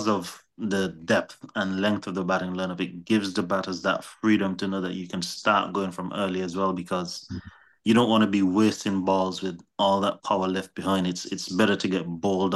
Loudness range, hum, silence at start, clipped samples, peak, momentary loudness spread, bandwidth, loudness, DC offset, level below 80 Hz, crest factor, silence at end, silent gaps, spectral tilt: 3 LU; none; 0 s; under 0.1%; -8 dBFS; 9 LU; 12.5 kHz; -26 LUFS; under 0.1%; -64 dBFS; 18 dB; 0 s; none; -5 dB/octave